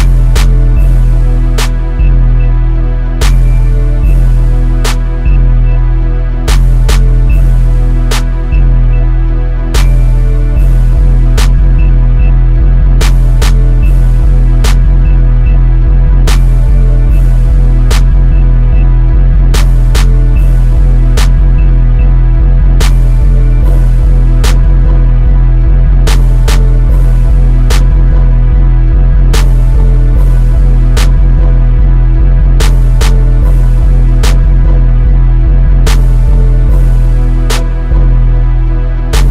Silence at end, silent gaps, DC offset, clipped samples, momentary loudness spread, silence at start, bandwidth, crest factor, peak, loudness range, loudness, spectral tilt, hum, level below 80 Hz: 0 s; none; under 0.1%; 2%; 3 LU; 0 s; 10.5 kHz; 4 dB; 0 dBFS; 2 LU; -10 LUFS; -6 dB/octave; none; -6 dBFS